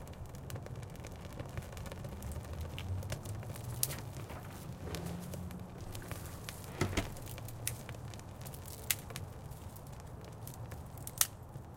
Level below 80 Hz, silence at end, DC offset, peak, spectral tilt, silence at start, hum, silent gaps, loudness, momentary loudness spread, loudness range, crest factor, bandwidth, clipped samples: -52 dBFS; 0 s; under 0.1%; -6 dBFS; -3.5 dB/octave; 0 s; none; none; -42 LUFS; 11 LU; 4 LU; 36 dB; 17 kHz; under 0.1%